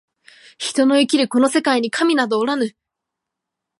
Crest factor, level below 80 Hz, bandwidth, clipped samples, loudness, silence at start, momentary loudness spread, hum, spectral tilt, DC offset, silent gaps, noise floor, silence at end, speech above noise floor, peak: 16 dB; -74 dBFS; 11.5 kHz; under 0.1%; -18 LUFS; 0.6 s; 8 LU; none; -3 dB/octave; under 0.1%; none; -82 dBFS; 1.1 s; 65 dB; -4 dBFS